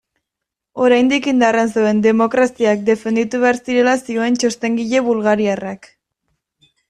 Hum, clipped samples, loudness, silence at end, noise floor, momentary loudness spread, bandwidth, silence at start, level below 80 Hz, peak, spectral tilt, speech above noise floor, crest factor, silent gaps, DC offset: none; under 0.1%; -16 LUFS; 1.15 s; -82 dBFS; 6 LU; 11.5 kHz; 0.75 s; -58 dBFS; -2 dBFS; -5 dB/octave; 67 dB; 14 dB; none; under 0.1%